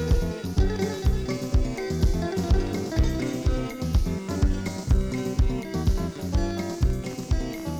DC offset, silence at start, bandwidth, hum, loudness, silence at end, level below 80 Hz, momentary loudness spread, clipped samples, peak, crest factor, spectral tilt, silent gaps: under 0.1%; 0 s; 16 kHz; none; -27 LUFS; 0 s; -26 dBFS; 4 LU; under 0.1%; -8 dBFS; 16 dB; -6.5 dB/octave; none